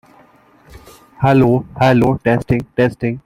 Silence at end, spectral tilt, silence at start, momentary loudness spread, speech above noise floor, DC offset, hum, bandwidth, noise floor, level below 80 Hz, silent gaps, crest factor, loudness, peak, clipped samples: 0.05 s; -8.5 dB/octave; 0.75 s; 5 LU; 35 dB; under 0.1%; none; 14.5 kHz; -49 dBFS; -42 dBFS; none; 16 dB; -15 LUFS; 0 dBFS; under 0.1%